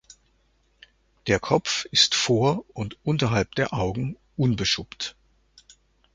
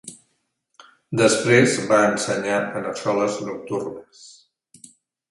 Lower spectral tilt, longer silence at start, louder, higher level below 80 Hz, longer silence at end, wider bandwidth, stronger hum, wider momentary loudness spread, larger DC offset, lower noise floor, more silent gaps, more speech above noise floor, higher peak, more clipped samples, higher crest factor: about the same, -4 dB/octave vs -4.5 dB/octave; first, 1.25 s vs 0.05 s; second, -24 LUFS vs -20 LUFS; first, -50 dBFS vs -62 dBFS; about the same, 1.05 s vs 1 s; second, 9.4 kHz vs 11.5 kHz; neither; about the same, 15 LU vs 14 LU; neither; second, -65 dBFS vs -71 dBFS; neither; second, 41 dB vs 51 dB; about the same, -4 dBFS vs -2 dBFS; neither; about the same, 22 dB vs 20 dB